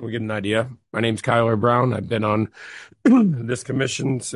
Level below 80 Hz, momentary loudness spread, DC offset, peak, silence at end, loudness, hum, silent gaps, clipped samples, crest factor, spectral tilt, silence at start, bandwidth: -54 dBFS; 9 LU; under 0.1%; -4 dBFS; 0 s; -21 LUFS; none; none; under 0.1%; 16 dB; -6 dB/octave; 0 s; 11.5 kHz